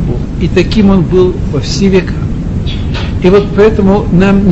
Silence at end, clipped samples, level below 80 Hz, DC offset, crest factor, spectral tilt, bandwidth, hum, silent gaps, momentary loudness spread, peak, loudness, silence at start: 0 s; 0.7%; -18 dBFS; under 0.1%; 8 dB; -7.5 dB/octave; 8 kHz; none; none; 9 LU; 0 dBFS; -10 LUFS; 0 s